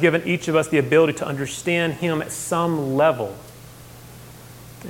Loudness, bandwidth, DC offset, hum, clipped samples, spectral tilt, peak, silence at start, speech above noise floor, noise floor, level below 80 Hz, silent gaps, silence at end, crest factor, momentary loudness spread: -21 LUFS; 17 kHz; under 0.1%; none; under 0.1%; -5 dB/octave; -2 dBFS; 0 s; 22 dB; -42 dBFS; -54 dBFS; none; 0 s; 20 dB; 24 LU